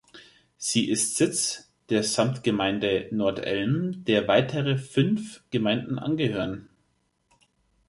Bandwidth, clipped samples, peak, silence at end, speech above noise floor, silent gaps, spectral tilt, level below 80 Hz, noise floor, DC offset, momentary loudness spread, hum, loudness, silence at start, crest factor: 12 kHz; under 0.1%; -8 dBFS; 1.25 s; 46 dB; none; -4.5 dB/octave; -60 dBFS; -71 dBFS; under 0.1%; 7 LU; none; -25 LUFS; 0.15 s; 20 dB